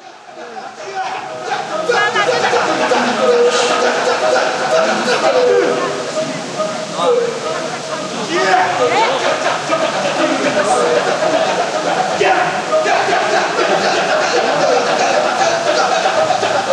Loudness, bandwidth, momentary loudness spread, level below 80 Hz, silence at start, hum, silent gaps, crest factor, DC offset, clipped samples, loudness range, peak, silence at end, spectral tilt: -15 LUFS; 12 kHz; 8 LU; -64 dBFS; 0 s; none; none; 14 dB; under 0.1%; under 0.1%; 3 LU; -2 dBFS; 0 s; -2.5 dB/octave